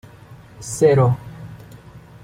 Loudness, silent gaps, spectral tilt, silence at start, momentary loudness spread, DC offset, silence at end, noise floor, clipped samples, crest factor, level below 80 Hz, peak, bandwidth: -18 LUFS; none; -6.5 dB/octave; 0.3 s; 24 LU; under 0.1%; 0.25 s; -43 dBFS; under 0.1%; 18 dB; -50 dBFS; -4 dBFS; 14.5 kHz